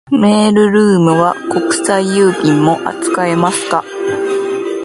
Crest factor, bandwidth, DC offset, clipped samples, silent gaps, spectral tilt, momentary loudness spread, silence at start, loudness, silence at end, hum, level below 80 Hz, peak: 12 dB; 11.5 kHz; under 0.1%; under 0.1%; none; -5.5 dB/octave; 7 LU; 0.1 s; -12 LUFS; 0 s; none; -54 dBFS; 0 dBFS